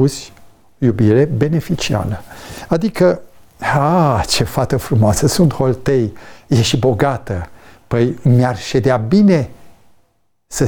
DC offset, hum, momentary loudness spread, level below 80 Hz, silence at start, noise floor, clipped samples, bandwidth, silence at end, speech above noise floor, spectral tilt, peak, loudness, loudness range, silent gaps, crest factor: under 0.1%; none; 12 LU; -38 dBFS; 0 s; -59 dBFS; under 0.1%; 19.5 kHz; 0 s; 45 dB; -6 dB/octave; -2 dBFS; -15 LUFS; 2 LU; none; 14 dB